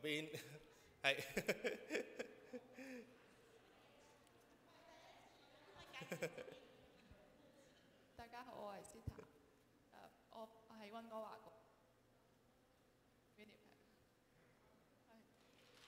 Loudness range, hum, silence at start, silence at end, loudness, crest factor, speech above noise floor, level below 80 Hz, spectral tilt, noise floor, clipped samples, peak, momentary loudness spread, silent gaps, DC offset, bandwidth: 15 LU; none; 0 s; 0 s; -49 LUFS; 32 dB; 30 dB; -78 dBFS; -3.5 dB/octave; -75 dBFS; under 0.1%; -22 dBFS; 25 LU; none; under 0.1%; 16 kHz